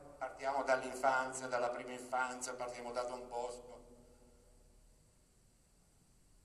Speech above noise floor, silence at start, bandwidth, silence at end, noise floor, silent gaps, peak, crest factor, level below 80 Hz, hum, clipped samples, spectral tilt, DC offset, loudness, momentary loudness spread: 30 dB; 0 s; 14 kHz; 1.65 s; -69 dBFS; none; -18 dBFS; 24 dB; -68 dBFS; none; under 0.1%; -2.5 dB/octave; under 0.1%; -39 LUFS; 12 LU